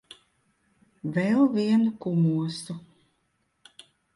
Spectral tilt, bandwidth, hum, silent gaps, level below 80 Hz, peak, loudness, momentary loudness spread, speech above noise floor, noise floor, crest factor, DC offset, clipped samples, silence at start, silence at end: -7.5 dB/octave; 11.5 kHz; none; none; -70 dBFS; -12 dBFS; -25 LUFS; 16 LU; 49 dB; -73 dBFS; 16 dB; under 0.1%; under 0.1%; 1.05 s; 1.35 s